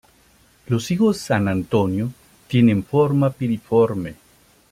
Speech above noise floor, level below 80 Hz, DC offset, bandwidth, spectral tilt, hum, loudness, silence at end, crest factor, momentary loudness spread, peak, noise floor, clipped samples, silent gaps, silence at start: 36 dB; -54 dBFS; under 0.1%; 15.5 kHz; -7.5 dB/octave; none; -20 LUFS; 0.6 s; 16 dB; 9 LU; -4 dBFS; -55 dBFS; under 0.1%; none; 0.7 s